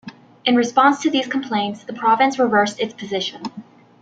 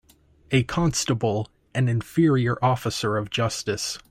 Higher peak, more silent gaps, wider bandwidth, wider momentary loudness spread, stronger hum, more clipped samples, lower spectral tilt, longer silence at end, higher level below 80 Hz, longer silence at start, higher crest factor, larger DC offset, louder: first, -2 dBFS vs -6 dBFS; neither; second, 9 kHz vs 16 kHz; first, 11 LU vs 6 LU; neither; neither; about the same, -4 dB/octave vs -5 dB/octave; first, 0.4 s vs 0.1 s; second, -68 dBFS vs -50 dBFS; second, 0.05 s vs 0.5 s; about the same, 18 dB vs 18 dB; neither; first, -19 LUFS vs -24 LUFS